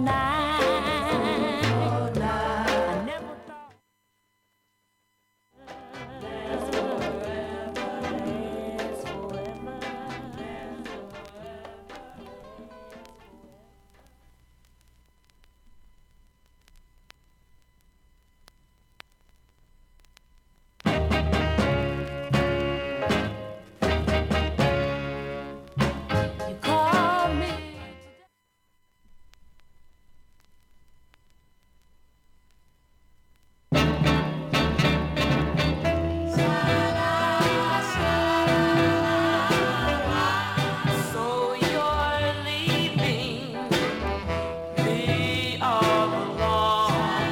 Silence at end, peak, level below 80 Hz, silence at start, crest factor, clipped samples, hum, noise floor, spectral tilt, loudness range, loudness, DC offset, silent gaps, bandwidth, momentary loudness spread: 0 s; -10 dBFS; -42 dBFS; 0 s; 18 dB; under 0.1%; none; -72 dBFS; -5.5 dB/octave; 15 LU; -25 LUFS; under 0.1%; none; 17 kHz; 18 LU